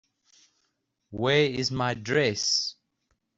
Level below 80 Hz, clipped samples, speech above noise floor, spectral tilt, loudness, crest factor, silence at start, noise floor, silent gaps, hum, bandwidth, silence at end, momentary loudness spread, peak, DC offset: -62 dBFS; under 0.1%; 51 dB; -3.5 dB/octave; -25 LUFS; 20 dB; 1.1 s; -77 dBFS; none; none; 8 kHz; 0.65 s; 8 LU; -10 dBFS; under 0.1%